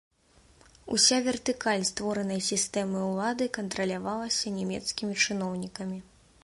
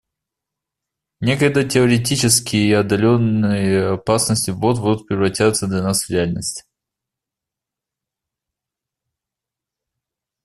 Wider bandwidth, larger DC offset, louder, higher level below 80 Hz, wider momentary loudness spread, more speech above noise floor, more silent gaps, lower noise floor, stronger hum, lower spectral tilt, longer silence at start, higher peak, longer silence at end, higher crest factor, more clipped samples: second, 11.5 kHz vs 13 kHz; neither; second, -28 LUFS vs -17 LUFS; second, -62 dBFS vs -50 dBFS; first, 11 LU vs 6 LU; second, 32 dB vs 69 dB; neither; second, -61 dBFS vs -86 dBFS; neither; second, -3 dB/octave vs -4.5 dB/octave; second, 0.85 s vs 1.2 s; second, -8 dBFS vs -2 dBFS; second, 0.4 s vs 3.85 s; about the same, 22 dB vs 18 dB; neither